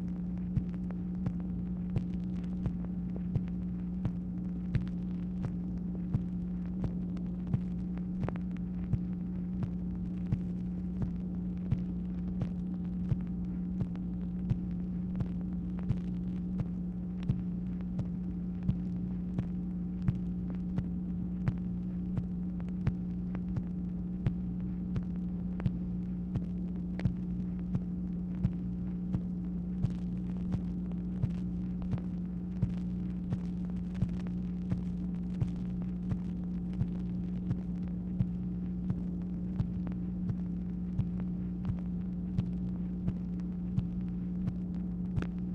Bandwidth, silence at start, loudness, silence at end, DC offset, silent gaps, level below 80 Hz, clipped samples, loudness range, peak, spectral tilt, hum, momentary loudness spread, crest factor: 4.4 kHz; 0 s; -36 LUFS; 0 s; under 0.1%; none; -44 dBFS; under 0.1%; 0 LU; -16 dBFS; -10.5 dB/octave; none; 2 LU; 18 dB